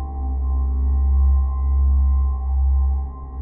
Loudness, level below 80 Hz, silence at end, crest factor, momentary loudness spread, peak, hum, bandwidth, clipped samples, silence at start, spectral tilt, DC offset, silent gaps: -21 LUFS; -18 dBFS; 0 s; 8 dB; 7 LU; -10 dBFS; none; 1.2 kHz; under 0.1%; 0 s; -14.5 dB/octave; under 0.1%; none